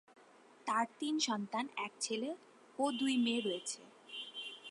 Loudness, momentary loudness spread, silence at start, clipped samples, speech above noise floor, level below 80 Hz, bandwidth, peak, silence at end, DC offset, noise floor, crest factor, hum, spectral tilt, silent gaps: -38 LUFS; 13 LU; 0.65 s; under 0.1%; 26 dB; under -90 dBFS; 11.5 kHz; -22 dBFS; 0 s; under 0.1%; -63 dBFS; 18 dB; none; -2.5 dB/octave; none